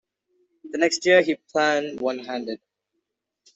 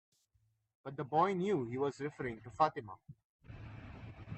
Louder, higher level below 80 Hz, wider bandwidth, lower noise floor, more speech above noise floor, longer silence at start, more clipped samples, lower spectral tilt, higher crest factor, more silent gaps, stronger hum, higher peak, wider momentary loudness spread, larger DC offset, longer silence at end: first, -22 LUFS vs -36 LUFS; second, -72 dBFS vs -66 dBFS; about the same, 8.2 kHz vs 8.4 kHz; about the same, -79 dBFS vs -77 dBFS; first, 57 dB vs 41 dB; second, 0.65 s vs 0.85 s; neither; second, -3 dB/octave vs -7 dB/octave; about the same, 20 dB vs 22 dB; second, none vs 3.24-3.39 s; neither; first, -4 dBFS vs -16 dBFS; second, 16 LU vs 20 LU; neither; first, 1 s vs 0 s